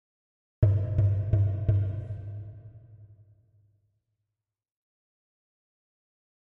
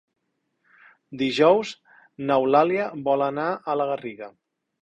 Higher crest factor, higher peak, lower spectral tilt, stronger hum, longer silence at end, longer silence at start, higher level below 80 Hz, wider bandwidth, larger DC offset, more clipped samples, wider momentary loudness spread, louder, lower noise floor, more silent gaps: about the same, 22 dB vs 20 dB; second, -10 dBFS vs -4 dBFS; first, -11.5 dB/octave vs -6 dB/octave; neither; first, 3.5 s vs 0.5 s; second, 0.6 s vs 1.1 s; first, -46 dBFS vs -68 dBFS; second, 2.6 kHz vs 9.2 kHz; neither; neither; second, 17 LU vs 21 LU; second, -28 LUFS vs -23 LUFS; first, -87 dBFS vs -74 dBFS; neither